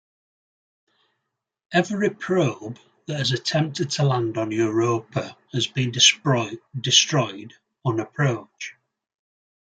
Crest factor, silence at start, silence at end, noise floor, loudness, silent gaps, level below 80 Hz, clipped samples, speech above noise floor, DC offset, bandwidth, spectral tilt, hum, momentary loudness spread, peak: 22 dB; 1.7 s; 0.9 s; -81 dBFS; -22 LUFS; none; -66 dBFS; under 0.1%; 58 dB; under 0.1%; 9.6 kHz; -3.5 dB/octave; none; 16 LU; -2 dBFS